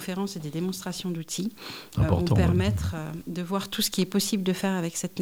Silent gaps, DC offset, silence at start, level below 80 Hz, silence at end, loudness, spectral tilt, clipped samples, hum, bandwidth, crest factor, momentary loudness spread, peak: none; under 0.1%; 0 s; -44 dBFS; 0 s; -27 LUFS; -5 dB/octave; under 0.1%; none; 17.5 kHz; 18 dB; 11 LU; -8 dBFS